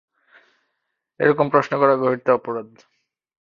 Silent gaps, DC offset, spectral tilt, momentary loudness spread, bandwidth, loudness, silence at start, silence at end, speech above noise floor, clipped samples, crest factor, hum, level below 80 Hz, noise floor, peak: none; under 0.1%; -7.5 dB/octave; 8 LU; 7.2 kHz; -19 LUFS; 1.2 s; 0.8 s; 58 dB; under 0.1%; 20 dB; none; -66 dBFS; -77 dBFS; -2 dBFS